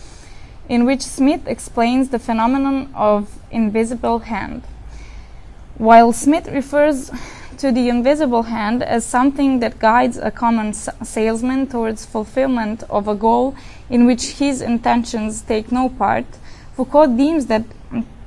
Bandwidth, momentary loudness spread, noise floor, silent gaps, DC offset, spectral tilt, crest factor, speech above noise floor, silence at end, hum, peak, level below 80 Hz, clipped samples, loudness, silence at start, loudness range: 12 kHz; 11 LU; -36 dBFS; none; under 0.1%; -5 dB/octave; 18 dB; 19 dB; 0 s; none; 0 dBFS; -38 dBFS; under 0.1%; -17 LUFS; 0 s; 4 LU